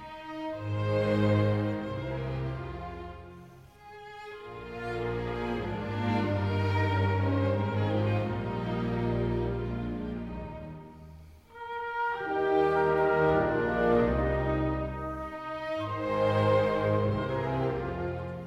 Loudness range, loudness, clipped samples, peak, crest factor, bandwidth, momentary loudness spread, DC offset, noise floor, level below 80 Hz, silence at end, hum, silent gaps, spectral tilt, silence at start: 9 LU; -30 LUFS; under 0.1%; -14 dBFS; 16 dB; 7.8 kHz; 17 LU; under 0.1%; -51 dBFS; -46 dBFS; 0 s; none; none; -8.5 dB/octave; 0 s